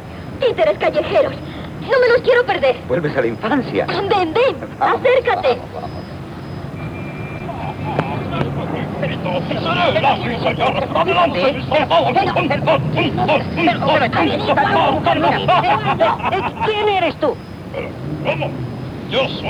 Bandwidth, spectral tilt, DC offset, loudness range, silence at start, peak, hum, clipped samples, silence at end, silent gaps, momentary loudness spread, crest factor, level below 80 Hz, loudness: 12.5 kHz; -7 dB/octave; under 0.1%; 6 LU; 0 s; 0 dBFS; none; under 0.1%; 0 s; none; 13 LU; 16 dB; -42 dBFS; -17 LUFS